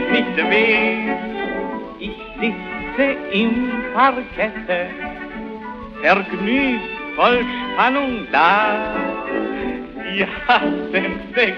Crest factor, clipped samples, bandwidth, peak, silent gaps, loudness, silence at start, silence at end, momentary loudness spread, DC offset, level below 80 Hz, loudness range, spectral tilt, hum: 18 dB; under 0.1%; 6.6 kHz; -2 dBFS; none; -19 LUFS; 0 s; 0 s; 13 LU; under 0.1%; -46 dBFS; 3 LU; -6.5 dB/octave; none